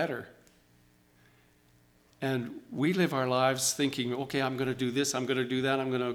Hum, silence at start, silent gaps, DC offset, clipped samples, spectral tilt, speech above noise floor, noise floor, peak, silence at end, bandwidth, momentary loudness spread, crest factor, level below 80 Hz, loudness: 60 Hz at -60 dBFS; 0 s; none; under 0.1%; under 0.1%; -4 dB/octave; 34 dB; -64 dBFS; -12 dBFS; 0 s; 19 kHz; 8 LU; 20 dB; -70 dBFS; -30 LUFS